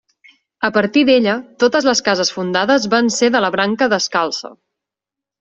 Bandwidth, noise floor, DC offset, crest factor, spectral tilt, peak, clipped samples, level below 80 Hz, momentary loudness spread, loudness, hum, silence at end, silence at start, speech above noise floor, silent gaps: 8.2 kHz; -86 dBFS; under 0.1%; 14 dB; -3.5 dB/octave; -2 dBFS; under 0.1%; -58 dBFS; 6 LU; -15 LUFS; none; 0.85 s; 0.6 s; 70 dB; none